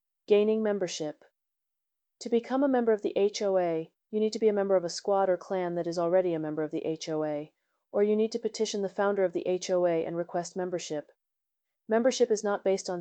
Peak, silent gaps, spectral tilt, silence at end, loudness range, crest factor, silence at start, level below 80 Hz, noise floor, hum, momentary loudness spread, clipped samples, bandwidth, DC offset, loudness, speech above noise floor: -12 dBFS; none; -5 dB/octave; 0 s; 3 LU; 18 dB; 0.3 s; -78 dBFS; -87 dBFS; none; 8 LU; under 0.1%; 8.8 kHz; under 0.1%; -29 LUFS; 59 dB